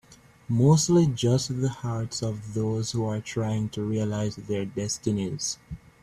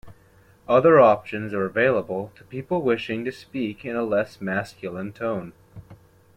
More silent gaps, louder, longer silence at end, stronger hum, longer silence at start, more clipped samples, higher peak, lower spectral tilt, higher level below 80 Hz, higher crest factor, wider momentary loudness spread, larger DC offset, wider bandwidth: neither; second, -26 LUFS vs -23 LUFS; second, 0.25 s vs 0.4 s; neither; about the same, 0.1 s vs 0.05 s; neither; second, -8 dBFS vs -4 dBFS; second, -6 dB/octave vs -7.5 dB/octave; first, -54 dBFS vs -60 dBFS; about the same, 18 dB vs 18 dB; second, 11 LU vs 17 LU; neither; first, 13.5 kHz vs 11 kHz